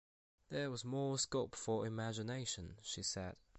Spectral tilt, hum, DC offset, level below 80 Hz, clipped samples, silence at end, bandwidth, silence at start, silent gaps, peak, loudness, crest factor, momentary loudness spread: -4 dB/octave; none; under 0.1%; -66 dBFS; under 0.1%; 0 s; 8.4 kHz; 0.5 s; none; -26 dBFS; -42 LUFS; 18 dB; 8 LU